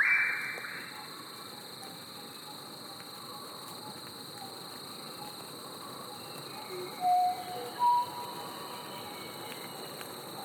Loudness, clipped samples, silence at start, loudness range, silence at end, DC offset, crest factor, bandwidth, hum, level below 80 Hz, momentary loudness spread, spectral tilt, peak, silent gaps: -36 LUFS; under 0.1%; 0 s; 10 LU; 0 s; under 0.1%; 20 dB; over 20 kHz; none; -82 dBFS; 15 LU; -2 dB/octave; -16 dBFS; none